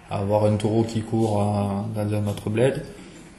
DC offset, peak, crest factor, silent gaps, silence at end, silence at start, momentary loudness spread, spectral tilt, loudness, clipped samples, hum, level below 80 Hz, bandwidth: under 0.1%; -8 dBFS; 16 dB; none; 0.05 s; 0.05 s; 6 LU; -7.5 dB/octave; -24 LUFS; under 0.1%; none; -52 dBFS; 12.5 kHz